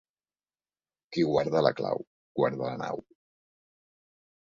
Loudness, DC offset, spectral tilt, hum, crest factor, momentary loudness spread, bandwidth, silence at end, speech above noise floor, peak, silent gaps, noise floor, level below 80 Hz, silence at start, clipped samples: -29 LUFS; under 0.1%; -7 dB/octave; 50 Hz at -65 dBFS; 24 dB; 11 LU; 7.4 kHz; 1.4 s; over 62 dB; -8 dBFS; 2.07-2.35 s; under -90 dBFS; -68 dBFS; 1.1 s; under 0.1%